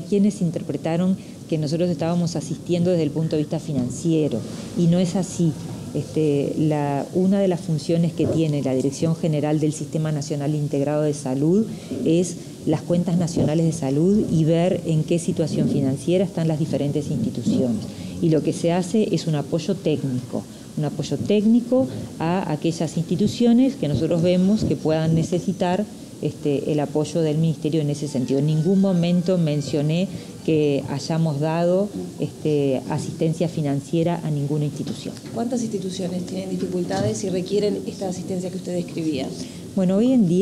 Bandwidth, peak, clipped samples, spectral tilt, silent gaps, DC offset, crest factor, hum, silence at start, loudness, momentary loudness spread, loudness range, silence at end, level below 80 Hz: 13 kHz; -8 dBFS; under 0.1%; -7 dB/octave; none; under 0.1%; 12 dB; none; 0 s; -22 LUFS; 9 LU; 4 LU; 0 s; -54 dBFS